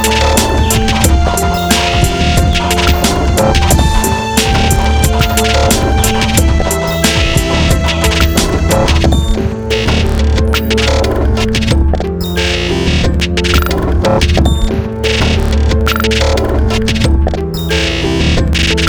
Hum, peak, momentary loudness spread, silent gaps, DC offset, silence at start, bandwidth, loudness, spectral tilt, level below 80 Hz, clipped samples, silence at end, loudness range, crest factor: none; 0 dBFS; 3 LU; none; under 0.1%; 0 s; over 20 kHz; -12 LUFS; -4.5 dB/octave; -14 dBFS; under 0.1%; 0 s; 2 LU; 10 dB